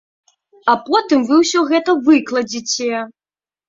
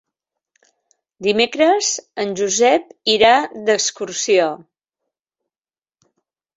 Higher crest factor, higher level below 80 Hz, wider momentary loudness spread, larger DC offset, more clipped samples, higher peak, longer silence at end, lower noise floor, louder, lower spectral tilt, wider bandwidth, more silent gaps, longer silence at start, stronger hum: about the same, 16 dB vs 18 dB; about the same, -62 dBFS vs -62 dBFS; about the same, 9 LU vs 10 LU; neither; neither; about the same, 0 dBFS vs -2 dBFS; second, 0.6 s vs 2 s; about the same, under -90 dBFS vs under -90 dBFS; about the same, -16 LUFS vs -17 LUFS; about the same, -2.5 dB/octave vs -2 dB/octave; about the same, 7.8 kHz vs 8 kHz; neither; second, 0.65 s vs 1.2 s; neither